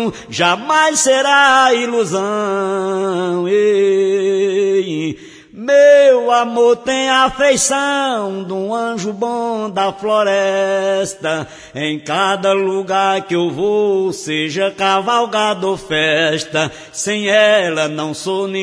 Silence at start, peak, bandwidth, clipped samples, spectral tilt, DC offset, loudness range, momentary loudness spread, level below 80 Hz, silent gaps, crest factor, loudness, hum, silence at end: 0 s; 0 dBFS; 11 kHz; under 0.1%; -3 dB/octave; under 0.1%; 5 LU; 10 LU; -54 dBFS; none; 14 dB; -15 LUFS; none; 0 s